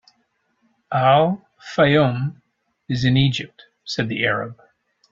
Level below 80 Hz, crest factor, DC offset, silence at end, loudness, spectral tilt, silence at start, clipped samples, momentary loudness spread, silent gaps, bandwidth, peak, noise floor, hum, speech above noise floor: -52 dBFS; 18 dB; under 0.1%; 0.6 s; -20 LUFS; -6.5 dB/octave; 0.9 s; under 0.1%; 14 LU; none; 7.6 kHz; -2 dBFS; -68 dBFS; none; 49 dB